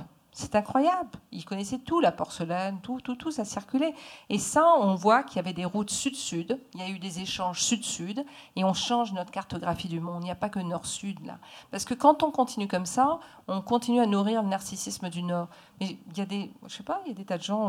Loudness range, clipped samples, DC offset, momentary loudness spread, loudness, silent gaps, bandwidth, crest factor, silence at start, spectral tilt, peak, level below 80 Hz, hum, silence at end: 5 LU; under 0.1%; under 0.1%; 14 LU; -28 LUFS; none; 15.5 kHz; 22 dB; 0 s; -4.5 dB/octave; -6 dBFS; -62 dBFS; none; 0 s